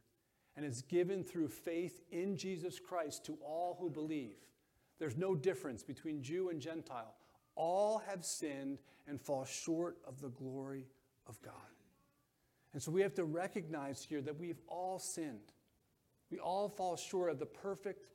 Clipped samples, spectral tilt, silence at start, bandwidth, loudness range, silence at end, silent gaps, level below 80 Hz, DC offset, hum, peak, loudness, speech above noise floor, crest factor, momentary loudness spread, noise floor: under 0.1%; -5 dB/octave; 0.55 s; 16.5 kHz; 4 LU; 0.05 s; none; -82 dBFS; under 0.1%; none; -24 dBFS; -42 LUFS; 37 dB; 20 dB; 14 LU; -79 dBFS